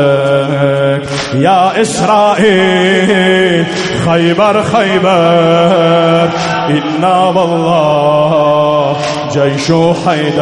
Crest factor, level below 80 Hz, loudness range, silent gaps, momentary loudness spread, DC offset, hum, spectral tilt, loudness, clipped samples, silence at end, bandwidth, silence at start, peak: 10 dB; -46 dBFS; 1 LU; none; 5 LU; under 0.1%; none; -5.5 dB/octave; -10 LUFS; under 0.1%; 0 s; 11.5 kHz; 0 s; 0 dBFS